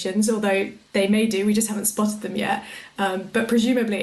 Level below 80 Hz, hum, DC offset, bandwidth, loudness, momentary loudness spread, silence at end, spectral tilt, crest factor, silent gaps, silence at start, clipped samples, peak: -62 dBFS; none; under 0.1%; 12.5 kHz; -22 LUFS; 6 LU; 0 s; -4 dB/octave; 12 dB; none; 0 s; under 0.1%; -10 dBFS